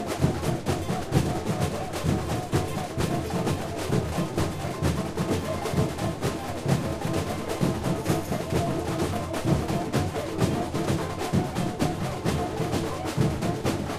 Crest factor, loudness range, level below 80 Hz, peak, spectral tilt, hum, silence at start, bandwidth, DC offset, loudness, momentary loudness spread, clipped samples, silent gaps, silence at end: 20 dB; 1 LU; -42 dBFS; -8 dBFS; -6 dB/octave; none; 0 s; 15.5 kHz; under 0.1%; -28 LUFS; 3 LU; under 0.1%; none; 0 s